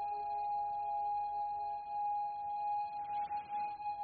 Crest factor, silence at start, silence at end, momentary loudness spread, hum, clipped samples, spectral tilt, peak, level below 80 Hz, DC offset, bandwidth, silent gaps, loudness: 8 dB; 0 s; 0 s; 3 LU; none; under 0.1%; -2 dB/octave; -32 dBFS; -72 dBFS; under 0.1%; 4.6 kHz; none; -39 LUFS